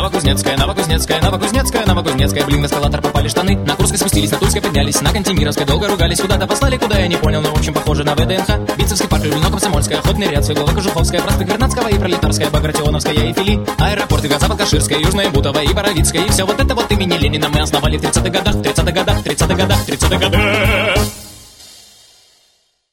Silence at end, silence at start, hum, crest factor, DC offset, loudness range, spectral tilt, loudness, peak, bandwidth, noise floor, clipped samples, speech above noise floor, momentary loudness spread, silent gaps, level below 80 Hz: 1.2 s; 0 s; none; 14 dB; under 0.1%; 1 LU; -4.5 dB/octave; -14 LUFS; 0 dBFS; 18 kHz; -58 dBFS; under 0.1%; 44 dB; 3 LU; none; -22 dBFS